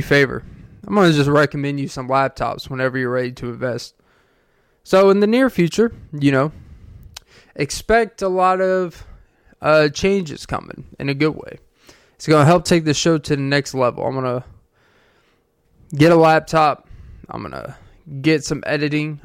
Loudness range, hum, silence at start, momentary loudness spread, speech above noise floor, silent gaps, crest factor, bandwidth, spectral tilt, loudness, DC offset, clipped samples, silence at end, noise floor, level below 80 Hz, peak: 3 LU; none; 0 s; 16 LU; 44 dB; none; 18 dB; 16 kHz; -5.5 dB/octave; -18 LUFS; under 0.1%; under 0.1%; 0.05 s; -61 dBFS; -44 dBFS; -2 dBFS